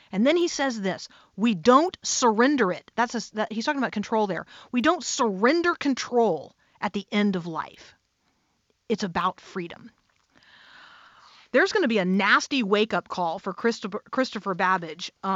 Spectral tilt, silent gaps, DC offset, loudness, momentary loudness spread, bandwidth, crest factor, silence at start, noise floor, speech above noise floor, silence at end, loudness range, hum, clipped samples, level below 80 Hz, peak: -4 dB/octave; none; under 0.1%; -24 LUFS; 13 LU; 8 kHz; 20 dB; 0.1 s; -71 dBFS; 46 dB; 0 s; 9 LU; none; under 0.1%; -66 dBFS; -6 dBFS